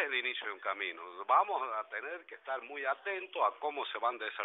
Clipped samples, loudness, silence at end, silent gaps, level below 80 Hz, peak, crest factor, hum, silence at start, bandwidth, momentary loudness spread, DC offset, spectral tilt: under 0.1%; -35 LUFS; 0 s; none; under -90 dBFS; -16 dBFS; 20 dB; none; 0 s; 4.1 kHz; 11 LU; under 0.1%; 4 dB/octave